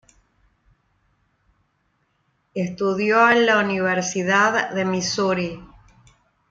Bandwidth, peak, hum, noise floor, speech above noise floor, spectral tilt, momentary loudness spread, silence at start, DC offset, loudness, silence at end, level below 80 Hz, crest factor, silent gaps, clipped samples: 8.6 kHz; -4 dBFS; none; -68 dBFS; 49 dB; -4 dB/octave; 13 LU; 2.55 s; under 0.1%; -20 LUFS; 0.85 s; -60 dBFS; 18 dB; none; under 0.1%